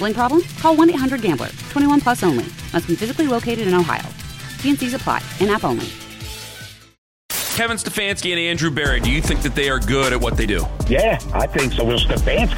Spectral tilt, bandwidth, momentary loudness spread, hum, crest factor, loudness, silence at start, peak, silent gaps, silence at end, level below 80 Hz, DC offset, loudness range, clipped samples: -4.5 dB/octave; 17 kHz; 10 LU; none; 16 dB; -19 LUFS; 0 s; -2 dBFS; 6.98-7.29 s; 0 s; -28 dBFS; under 0.1%; 4 LU; under 0.1%